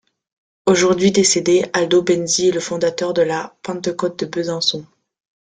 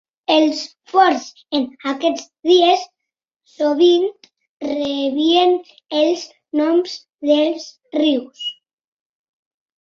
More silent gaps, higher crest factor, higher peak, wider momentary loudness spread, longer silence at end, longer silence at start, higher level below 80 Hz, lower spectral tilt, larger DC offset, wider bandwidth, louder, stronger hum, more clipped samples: second, none vs 4.49-4.60 s, 7.14-7.18 s; about the same, 16 dB vs 16 dB; about the same, -2 dBFS vs -2 dBFS; about the same, 10 LU vs 12 LU; second, 0.7 s vs 1.3 s; first, 0.65 s vs 0.3 s; first, -58 dBFS vs -66 dBFS; about the same, -3.5 dB/octave vs -2.5 dB/octave; neither; first, 9.4 kHz vs 7.6 kHz; about the same, -17 LUFS vs -18 LUFS; neither; neither